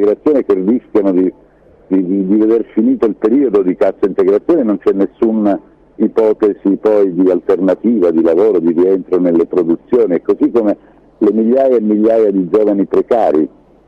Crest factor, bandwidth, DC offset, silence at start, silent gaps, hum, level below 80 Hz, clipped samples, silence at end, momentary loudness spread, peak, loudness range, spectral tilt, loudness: 10 dB; 5.6 kHz; under 0.1%; 0 s; none; none; -52 dBFS; under 0.1%; 0.4 s; 4 LU; -4 dBFS; 2 LU; -9.5 dB/octave; -13 LUFS